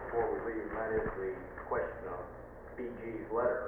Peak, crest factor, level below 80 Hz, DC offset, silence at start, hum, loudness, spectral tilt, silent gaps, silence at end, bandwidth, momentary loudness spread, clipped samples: -20 dBFS; 16 dB; -54 dBFS; under 0.1%; 0 s; none; -38 LUFS; -9.5 dB/octave; none; 0 s; 3.4 kHz; 10 LU; under 0.1%